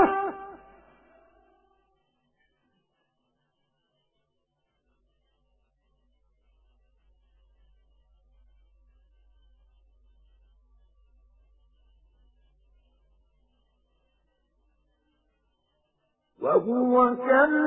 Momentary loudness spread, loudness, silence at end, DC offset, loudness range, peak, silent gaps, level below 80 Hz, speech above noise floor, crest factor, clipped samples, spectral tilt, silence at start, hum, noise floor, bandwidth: 23 LU; -23 LUFS; 0 s; under 0.1%; 20 LU; -8 dBFS; none; -64 dBFS; 56 dB; 26 dB; under 0.1%; 1 dB/octave; 0 s; none; -77 dBFS; 3.8 kHz